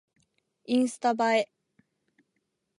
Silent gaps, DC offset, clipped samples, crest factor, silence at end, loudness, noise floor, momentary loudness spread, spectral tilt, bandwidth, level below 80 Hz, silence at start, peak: none; under 0.1%; under 0.1%; 18 dB; 1.35 s; -27 LUFS; -79 dBFS; 4 LU; -3.5 dB/octave; 11.5 kHz; -86 dBFS; 0.7 s; -12 dBFS